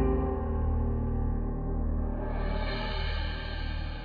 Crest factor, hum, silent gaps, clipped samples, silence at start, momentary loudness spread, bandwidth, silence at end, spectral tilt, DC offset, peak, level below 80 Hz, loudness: 14 dB; none; none; under 0.1%; 0 s; 5 LU; 5 kHz; 0 s; -9 dB/octave; under 0.1%; -16 dBFS; -32 dBFS; -33 LUFS